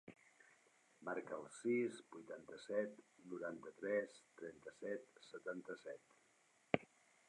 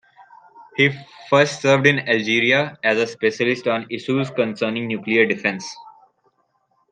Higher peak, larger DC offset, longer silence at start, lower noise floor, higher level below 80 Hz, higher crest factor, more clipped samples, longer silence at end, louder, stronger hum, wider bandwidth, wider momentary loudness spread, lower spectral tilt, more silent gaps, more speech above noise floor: second, -16 dBFS vs -2 dBFS; neither; second, 0.05 s vs 0.2 s; first, -76 dBFS vs -66 dBFS; second, -86 dBFS vs -66 dBFS; first, 32 dB vs 18 dB; neither; second, 0.45 s vs 1 s; second, -47 LUFS vs -19 LUFS; neither; first, 11 kHz vs 9.6 kHz; first, 14 LU vs 9 LU; about the same, -5.5 dB/octave vs -5 dB/octave; neither; second, 29 dB vs 47 dB